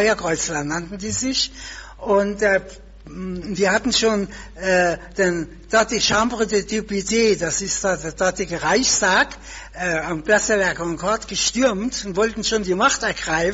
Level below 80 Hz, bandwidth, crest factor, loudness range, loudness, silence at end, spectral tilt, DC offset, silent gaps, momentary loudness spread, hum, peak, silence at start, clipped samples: -42 dBFS; 8.2 kHz; 16 dB; 2 LU; -20 LUFS; 0 s; -2.5 dB/octave; under 0.1%; none; 9 LU; none; -4 dBFS; 0 s; under 0.1%